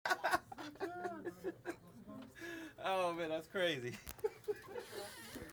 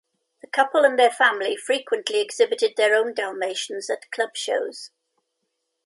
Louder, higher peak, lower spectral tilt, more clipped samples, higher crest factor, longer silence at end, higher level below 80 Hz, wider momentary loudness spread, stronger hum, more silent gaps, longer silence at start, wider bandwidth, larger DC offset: second, -42 LUFS vs -22 LUFS; second, -18 dBFS vs -4 dBFS; first, -4 dB/octave vs -0.5 dB/octave; neither; about the same, 24 dB vs 20 dB; second, 0 s vs 1 s; first, -70 dBFS vs -84 dBFS; about the same, 13 LU vs 11 LU; neither; neither; second, 0.05 s vs 0.55 s; first, over 20 kHz vs 11.5 kHz; neither